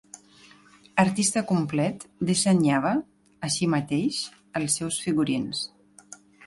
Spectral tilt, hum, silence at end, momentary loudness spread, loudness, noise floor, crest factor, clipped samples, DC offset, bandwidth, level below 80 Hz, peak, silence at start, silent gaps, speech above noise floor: -4.5 dB/octave; none; 0 s; 10 LU; -25 LUFS; -54 dBFS; 22 dB; under 0.1%; under 0.1%; 11.5 kHz; -62 dBFS; -4 dBFS; 0.15 s; none; 30 dB